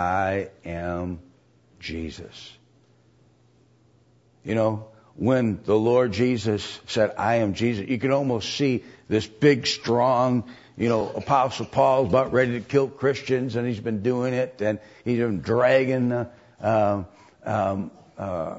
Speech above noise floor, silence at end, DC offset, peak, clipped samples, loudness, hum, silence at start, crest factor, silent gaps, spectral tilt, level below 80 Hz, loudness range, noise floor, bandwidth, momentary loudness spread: 36 dB; 0 s; under 0.1%; -6 dBFS; under 0.1%; -24 LUFS; none; 0 s; 18 dB; none; -6.5 dB/octave; -54 dBFS; 10 LU; -59 dBFS; 8 kHz; 14 LU